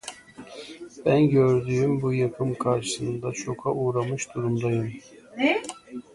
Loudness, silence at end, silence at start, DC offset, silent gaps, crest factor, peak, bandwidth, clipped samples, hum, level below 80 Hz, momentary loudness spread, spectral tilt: -25 LUFS; 0.15 s; 0.05 s; under 0.1%; none; 16 dB; -8 dBFS; 11.5 kHz; under 0.1%; none; -58 dBFS; 20 LU; -6 dB/octave